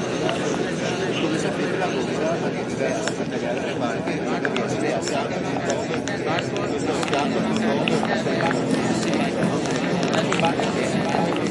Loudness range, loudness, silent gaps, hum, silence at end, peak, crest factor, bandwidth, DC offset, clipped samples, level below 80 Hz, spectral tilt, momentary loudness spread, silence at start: 2 LU; -23 LUFS; none; none; 0 s; -4 dBFS; 18 dB; 11.5 kHz; under 0.1%; under 0.1%; -56 dBFS; -5 dB/octave; 4 LU; 0 s